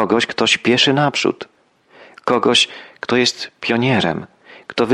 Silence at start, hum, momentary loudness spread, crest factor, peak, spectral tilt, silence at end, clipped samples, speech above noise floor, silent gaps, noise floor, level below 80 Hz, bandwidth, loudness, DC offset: 0 s; none; 14 LU; 16 dB; -2 dBFS; -4 dB/octave; 0 s; under 0.1%; 34 dB; none; -51 dBFS; -58 dBFS; 12 kHz; -16 LUFS; under 0.1%